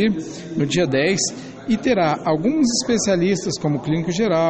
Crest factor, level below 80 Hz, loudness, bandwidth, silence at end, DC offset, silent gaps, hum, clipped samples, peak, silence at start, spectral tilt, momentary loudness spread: 14 dB; -50 dBFS; -20 LUFS; 8.8 kHz; 0 s; under 0.1%; none; none; under 0.1%; -6 dBFS; 0 s; -4.5 dB/octave; 6 LU